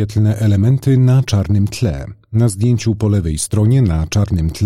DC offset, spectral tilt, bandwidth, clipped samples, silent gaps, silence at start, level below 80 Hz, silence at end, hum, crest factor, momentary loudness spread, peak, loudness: 0.2%; -7 dB/octave; 14 kHz; under 0.1%; none; 0 s; -30 dBFS; 0 s; none; 10 dB; 5 LU; -4 dBFS; -15 LUFS